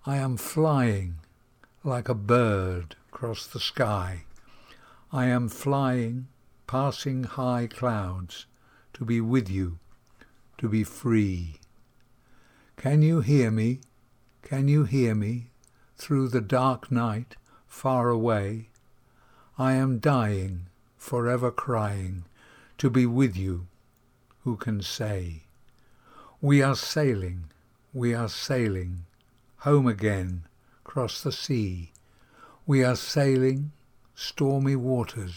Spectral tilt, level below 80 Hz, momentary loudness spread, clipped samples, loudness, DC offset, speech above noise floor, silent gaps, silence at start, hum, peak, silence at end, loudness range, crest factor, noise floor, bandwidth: -6.5 dB/octave; -58 dBFS; 16 LU; under 0.1%; -27 LUFS; under 0.1%; 37 dB; none; 0.05 s; none; -8 dBFS; 0 s; 4 LU; 18 dB; -63 dBFS; 19 kHz